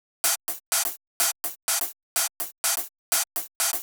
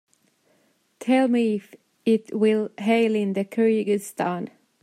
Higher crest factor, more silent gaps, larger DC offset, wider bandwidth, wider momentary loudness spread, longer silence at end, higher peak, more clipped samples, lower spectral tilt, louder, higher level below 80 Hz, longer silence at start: first, 20 dB vs 14 dB; first, 0.66-0.72 s, 1.07-1.20 s, 1.62-1.68 s, 2.03-2.16 s, 2.58-2.64 s, 2.98-3.12 s, 3.55-3.60 s vs none; neither; first, over 20 kHz vs 14.5 kHz; second, 4 LU vs 9 LU; second, 0 s vs 0.35 s; about the same, -8 dBFS vs -10 dBFS; neither; second, 3.5 dB/octave vs -6 dB/octave; about the same, -25 LUFS vs -23 LUFS; about the same, -82 dBFS vs -78 dBFS; second, 0.25 s vs 1 s